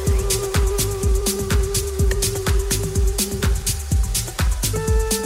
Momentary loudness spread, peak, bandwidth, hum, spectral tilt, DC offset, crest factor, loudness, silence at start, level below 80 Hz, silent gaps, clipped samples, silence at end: 2 LU; -6 dBFS; 16.5 kHz; none; -4 dB/octave; under 0.1%; 14 dB; -21 LUFS; 0 s; -22 dBFS; none; under 0.1%; 0 s